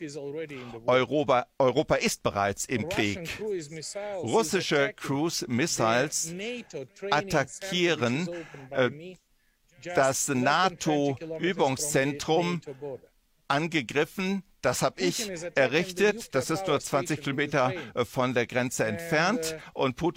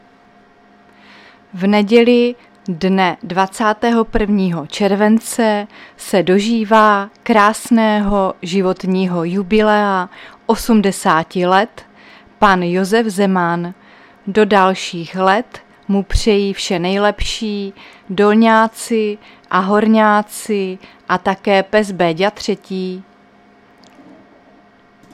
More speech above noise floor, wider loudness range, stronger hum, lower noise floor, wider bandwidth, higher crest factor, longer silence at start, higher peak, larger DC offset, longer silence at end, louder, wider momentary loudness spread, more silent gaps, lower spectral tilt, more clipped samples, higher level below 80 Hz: first, 39 dB vs 33 dB; about the same, 2 LU vs 3 LU; neither; first, -66 dBFS vs -48 dBFS; first, 16.5 kHz vs 14.5 kHz; about the same, 20 dB vs 16 dB; second, 0 s vs 1.55 s; second, -8 dBFS vs 0 dBFS; neither; second, 0.05 s vs 2.1 s; second, -27 LUFS vs -15 LUFS; about the same, 11 LU vs 12 LU; neither; second, -4 dB/octave vs -5.5 dB/octave; neither; second, -60 dBFS vs -36 dBFS